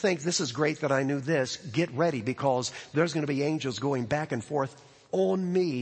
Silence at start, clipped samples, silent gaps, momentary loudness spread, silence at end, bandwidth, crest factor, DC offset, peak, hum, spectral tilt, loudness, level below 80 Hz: 0 s; under 0.1%; none; 4 LU; 0 s; 8.8 kHz; 16 dB; under 0.1%; -12 dBFS; none; -5 dB/octave; -29 LUFS; -66 dBFS